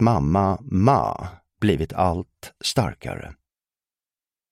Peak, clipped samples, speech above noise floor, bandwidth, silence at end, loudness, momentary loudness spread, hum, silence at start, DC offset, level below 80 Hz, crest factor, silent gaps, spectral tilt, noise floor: -2 dBFS; under 0.1%; over 68 dB; 15.5 kHz; 1.2 s; -22 LUFS; 17 LU; none; 0 s; under 0.1%; -42 dBFS; 20 dB; none; -6.5 dB/octave; under -90 dBFS